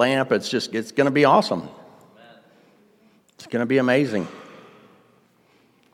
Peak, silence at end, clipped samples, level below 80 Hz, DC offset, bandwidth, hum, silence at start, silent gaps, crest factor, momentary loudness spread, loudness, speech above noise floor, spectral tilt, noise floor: -4 dBFS; 1.5 s; under 0.1%; -74 dBFS; under 0.1%; 15 kHz; none; 0 s; none; 20 dB; 14 LU; -21 LUFS; 39 dB; -5.5 dB/octave; -59 dBFS